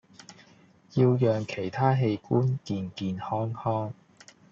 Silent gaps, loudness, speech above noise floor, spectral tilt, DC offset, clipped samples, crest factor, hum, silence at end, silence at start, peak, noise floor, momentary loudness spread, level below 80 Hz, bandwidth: none; -28 LUFS; 31 dB; -8 dB/octave; under 0.1%; under 0.1%; 18 dB; none; 0.6 s; 0.3 s; -10 dBFS; -57 dBFS; 10 LU; -66 dBFS; 7.4 kHz